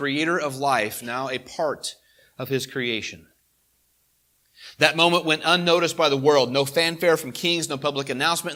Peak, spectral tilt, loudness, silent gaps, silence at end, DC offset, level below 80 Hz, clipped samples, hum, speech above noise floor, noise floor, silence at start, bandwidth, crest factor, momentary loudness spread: 0 dBFS; -3.5 dB/octave; -22 LUFS; none; 0 s; under 0.1%; -68 dBFS; under 0.1%; none; 44 dB; -66 dBFS; 0 s; 16.5 kHz; 24 dB; 10 LU